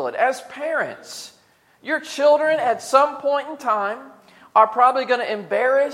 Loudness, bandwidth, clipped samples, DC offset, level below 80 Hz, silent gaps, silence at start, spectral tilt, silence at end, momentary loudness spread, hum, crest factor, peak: -20 LUFS; 15 kHz; under 0.1%; under 0.1%; -78 dBFS; none; 0 s; -3 dB/octave; 0 s; 17 LU; none; 20 dB; -2 dBFS